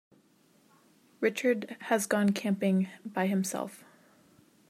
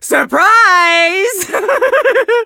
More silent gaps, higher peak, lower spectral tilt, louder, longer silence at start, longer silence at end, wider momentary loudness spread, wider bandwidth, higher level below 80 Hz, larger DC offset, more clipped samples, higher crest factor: neither; second, -12 dBFS vs 0 dBFS; first, -5.5 dB/octave vs -0.5 dB/octave; second, -30 LUFS vs -10 LUFS; first, 1.2 s vs 0 s; first, 0.95 s vs 0 s; about the same, 7 LU vs 8 LU; second, 15.5 kHz vs 17.5 kHz; second, -80 dBFS vs -58 dBFS; neither; neither; first, 18 dB vs 10 dB